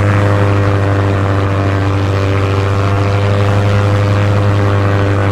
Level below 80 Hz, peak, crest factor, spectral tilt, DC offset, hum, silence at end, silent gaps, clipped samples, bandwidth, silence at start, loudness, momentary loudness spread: -32 dBFS; 0 dBFS; 12 dB; -7.5 dB/octave; 0.8%; none; 0 s; none; under 0.1%; 8.6 kHz; 0 s; -13 LUFS; 2 LU